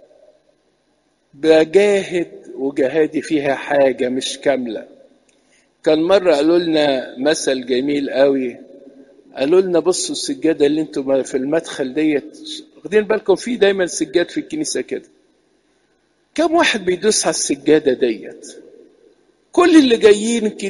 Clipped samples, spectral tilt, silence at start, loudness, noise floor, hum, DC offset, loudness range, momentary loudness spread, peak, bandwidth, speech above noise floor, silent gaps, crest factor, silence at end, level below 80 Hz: under 0.1%; -3.5 dB/octave; 1.4 s; -16 LUFS; -63 dBFS; none; under 0.1%; 3 LU; 12 LU; 0 dBFS; 11.5 kHz; 46 dB; none; 18 dB; 0 s; -58 dBFS